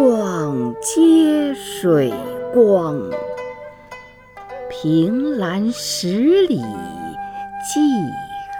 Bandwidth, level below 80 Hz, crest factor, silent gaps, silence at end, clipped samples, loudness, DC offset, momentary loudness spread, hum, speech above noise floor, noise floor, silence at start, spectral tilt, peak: 18.5 kHz; -54 dBFS; 16 dB; none; 0 s; under 0.1%; -18 LUFS; under 0.1%; 17 LU; 50 Hz at -50 dBFS; 23 dB; -40 dBFS; 0 s; -5.5 dB/octave; -2 dBFS